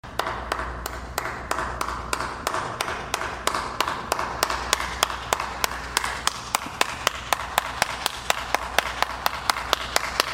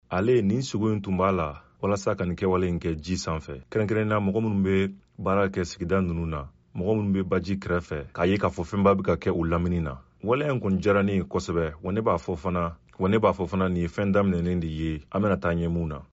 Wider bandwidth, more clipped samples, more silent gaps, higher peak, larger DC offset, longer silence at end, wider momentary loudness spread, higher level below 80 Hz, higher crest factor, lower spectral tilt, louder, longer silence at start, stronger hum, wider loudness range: first, 17 kHz vs 8 kHz; neither; neither; first, -2 dBFS vs -8 dBFS; neither; about the same, 0 s vs 0.1 s; second, 5 LU vs 8 LU; about the same, -42 dBFS vs -44 dBFS; first, 26 dB vs 16 dB; second, -1.5 dB/octave vs -7 dB/octave; about the same, -26 LUFS vs -26 LUFS; about the same, 0.05 s vs 0.1 s; neither; about the same, 3 LU vs 2 LU